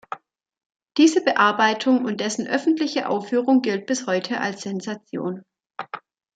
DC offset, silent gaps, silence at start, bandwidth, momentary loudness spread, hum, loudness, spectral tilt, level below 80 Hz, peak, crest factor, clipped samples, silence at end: under 0.1%; 0.66-0.70 s; 0.1 s; 9.2 kHz; 19 LU; none; -21 LUFS; -4 dB/octave; -74 dBFS; -4 dBFS; 18 dB; under 0.1%; 0.4 s